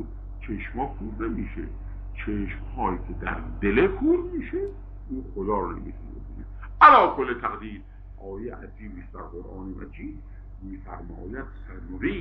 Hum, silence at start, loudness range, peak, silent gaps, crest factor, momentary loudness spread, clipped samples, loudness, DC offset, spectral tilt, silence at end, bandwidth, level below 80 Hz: none; 0 s; 18 LU; -2 dBFS; none; 24 dB; 19 LU; under 0.1%; -24 LUFS; under 0.1%; -4.5 dB/octave; 0 s; 5.8 kHz; -38 dBFS